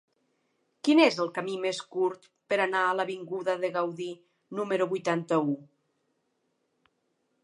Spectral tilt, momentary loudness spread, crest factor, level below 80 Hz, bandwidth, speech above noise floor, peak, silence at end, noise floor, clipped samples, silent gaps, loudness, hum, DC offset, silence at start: -5 dB/octave; 14 LU; 22 dB; -88 dBFS; 11 kHz; 48 dB; -8 dBFS; 1.8 s; -76 dBFS; under 0.1%; none; -28 LUFS; none; under 0.1%; 0.85 s